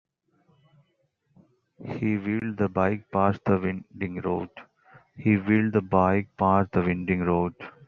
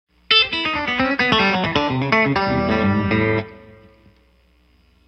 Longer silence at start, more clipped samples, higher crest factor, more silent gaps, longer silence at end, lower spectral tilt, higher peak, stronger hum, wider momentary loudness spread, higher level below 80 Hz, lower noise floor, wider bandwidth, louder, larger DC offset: first, 1.8 s vs 0.3 s; neither; about the same, 22 dB vs 20 dB; neither; second, 0.2 s vs 1.5 s; first, -8 dB/octave vs -6 dB/octave; second, -6 dBFS vs 0 dBFS; neither; first, 10 LU vs 6 LU; second, -62 dBFS vs -44 dBFS; first, -71 dBFS vs -56 dBFS; second, 4.8 kHz vs 8.4 kHz; second, -25 LUFS vs -18 LUFS; neither